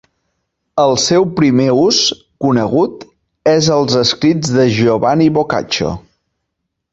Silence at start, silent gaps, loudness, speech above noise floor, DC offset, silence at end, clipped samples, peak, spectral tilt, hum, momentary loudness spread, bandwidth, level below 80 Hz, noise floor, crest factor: 0.75 s; none; -13 LUFS; 61 dB; under 0.1%; 0.95 s; under 0.1%; -2 dBFS; -5 dB/octave; none; 7 LU; 8.2 kHz; -46 dBFS; -74 dBFS; 12 dB